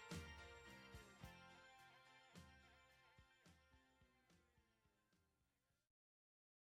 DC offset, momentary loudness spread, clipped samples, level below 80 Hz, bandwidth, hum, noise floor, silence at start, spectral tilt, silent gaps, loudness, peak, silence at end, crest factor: under 0.1%; 11 LU; under 0.1%; -74 dBFS; 15 kHz; none; -88 dBFS; 0 s; -4 dB/octave; none; -62 LUFS; -38 dBFS; 0.9 s; 28 dB